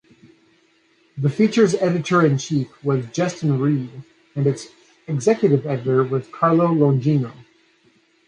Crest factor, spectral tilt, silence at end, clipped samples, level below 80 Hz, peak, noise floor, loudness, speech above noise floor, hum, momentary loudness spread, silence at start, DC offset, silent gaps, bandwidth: 16 dB; -7 dB/octave; 0.85 s; under 0.1%; -64 dBFS; -4 dBFS; -59 dBFS; -20 LUFS; 41 dB; none; 11 LU; 1.15 s; under 0.1%; none; 10 kHz